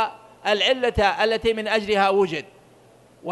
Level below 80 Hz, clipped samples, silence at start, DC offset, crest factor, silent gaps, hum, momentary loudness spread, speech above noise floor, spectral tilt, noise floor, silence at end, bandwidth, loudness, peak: -44 dBFS; under 0.1%; 0 s; under 0.1%; 18 dB; none; none; 10 LU; 32 dB; -4 dB/octave; -52 dBFS; 0 s; 12 kHz; -21 LUFS; -6 dBFS